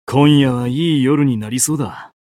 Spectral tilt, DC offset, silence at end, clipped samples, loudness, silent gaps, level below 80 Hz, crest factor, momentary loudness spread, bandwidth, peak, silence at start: -5.5 dB/octave; under 0.1%; 0.15 s; under 0.1%; -15 LUFS; none; -50 dBFS; 14 dB; 7 LU; 16 kHz; 0 dBFS; 0.1 s